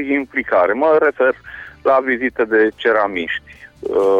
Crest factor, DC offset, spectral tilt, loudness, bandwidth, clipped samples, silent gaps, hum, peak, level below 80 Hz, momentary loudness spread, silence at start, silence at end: 12 dB; under 0.1%; -6 dB/octave; -16 LUFS; 7.2 kHz; under 0.1%; none; none; -4 dBFS; -52 dBFS; 11 LU; 0 s; 0 s